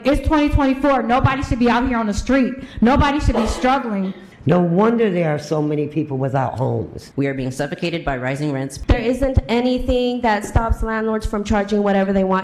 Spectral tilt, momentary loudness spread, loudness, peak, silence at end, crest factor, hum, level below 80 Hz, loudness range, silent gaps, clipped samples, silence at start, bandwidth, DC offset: -6.5 dB/octave; 7 LU; -19 LUFS; -4 dBFS; 0 s; 14 dB; none; -28 dBFS; 4 LU; none; under 0.1%; 0 s; 13.5 kHz; under 0.1%